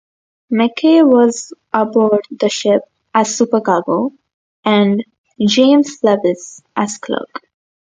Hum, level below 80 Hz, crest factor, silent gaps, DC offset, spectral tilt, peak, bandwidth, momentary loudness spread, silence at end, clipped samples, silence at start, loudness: none; -64 dBFS; 14 dB; 4.34-4.63 s, 5.18-5.24 s; under 0.1%; -4.5 dB/octave; 0 dBFS; 9.4 kHz; 13 LU; 0.55 s; under 0.1%; 0.5 s; -15 LUFS